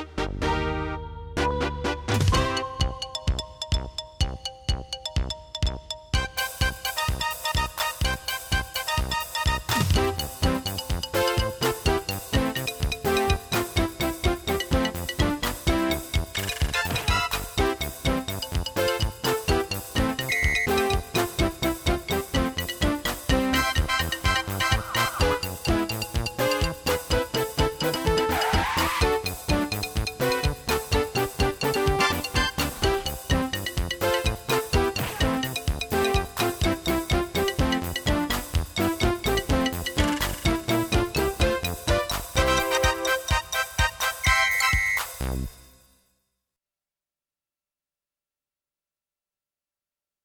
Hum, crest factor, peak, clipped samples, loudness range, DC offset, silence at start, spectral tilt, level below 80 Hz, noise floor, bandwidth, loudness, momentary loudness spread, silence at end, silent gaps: none; 18 dB; -8 dBFS; under 0.1%; 3 LU; under 0.1%; 0 s; -4 dB/octave; -34 dBFS; under -90 dBFS; over 20 kHz; -25 LUFS; 6 LU; 4.6 s; none